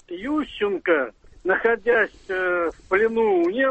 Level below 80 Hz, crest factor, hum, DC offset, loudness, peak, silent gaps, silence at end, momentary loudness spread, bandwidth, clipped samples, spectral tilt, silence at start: -52 dBFS; 16 dB; none; under 0.1%; -22 LUFS; -8 dBFS; none; 0 s; 7 LU; 8.4 kHz; under 0.1%; -6 dB/octave; 0.1 s